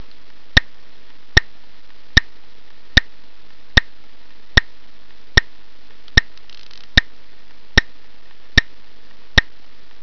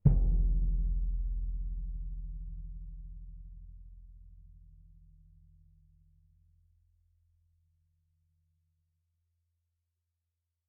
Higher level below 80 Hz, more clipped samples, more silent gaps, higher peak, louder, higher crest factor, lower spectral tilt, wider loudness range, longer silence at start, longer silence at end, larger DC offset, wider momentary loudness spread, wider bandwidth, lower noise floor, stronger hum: first, -28 dBFS vs -36 dBFS; neither; neither; first, 0 dBFS vs -12 dBFS; first, -17 LUFS vs -36 LUFS; about the same, 22 dB vs 24 dB; second, -3.5 dB/octave vs -14 dB/octave; second, 1 LU vs 25 LU; first, 1.35 s vs 0.05 s; second, 0.6 s vs 6.15 s; first, 6% vs under 0.1%; second, 1 LU vs 26 LU; first, 5.4 kHz vs 1 kHz; second, -51 dBFS vs -86 dBFS; neither